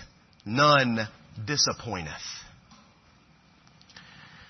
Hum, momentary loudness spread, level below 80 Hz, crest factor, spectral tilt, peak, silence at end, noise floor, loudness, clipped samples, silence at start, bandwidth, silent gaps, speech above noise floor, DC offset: none; 22 LU; -60 dBFS; 22 dB; -3.5 dB/octave; -8 dBFS; 0.5 s; -59 dBFS; -25 LUFS; under 0.1%; 0 s; 6.4 kHz; none; 34 dB; under 0.1%